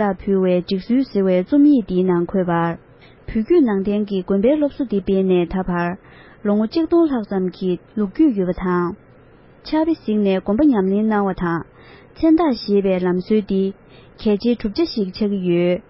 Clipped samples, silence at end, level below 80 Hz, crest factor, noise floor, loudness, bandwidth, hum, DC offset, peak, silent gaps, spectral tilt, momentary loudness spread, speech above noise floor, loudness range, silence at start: under 0.1%; 0.1 s; -44 dBFS; 14 dB; -47 dBFS; -19 LUFS; 5.8 kHz; none; under 0.1%; -6 dBFS; none; -12 dB/octave; 8 LU; 29 dB; 2 LU; 0 s